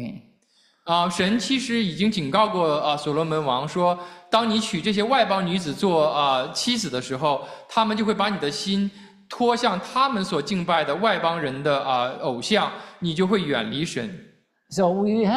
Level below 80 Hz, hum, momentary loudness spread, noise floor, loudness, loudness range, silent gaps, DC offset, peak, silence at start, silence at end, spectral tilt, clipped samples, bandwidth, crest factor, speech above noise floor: -60 dBFS; none; 7 LU; -62 dBFS; -23 LUFS; 2 LU; none; under 0.1%; -4 dBFS; 0 s; 0 s; -5 dB/octave; under 0.1%; 13.5 kHz; 18 dB; 40 dB